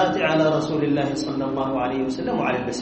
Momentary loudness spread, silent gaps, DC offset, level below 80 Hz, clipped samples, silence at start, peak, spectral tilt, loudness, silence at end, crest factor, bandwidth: 5 LU; none; under 0.1%; -52 dBFS; under 0.1%; 0 s; -8 dBFS; -6 dB/octave; -23 LUFS; 0 s; 14 dB; 8.4 kHz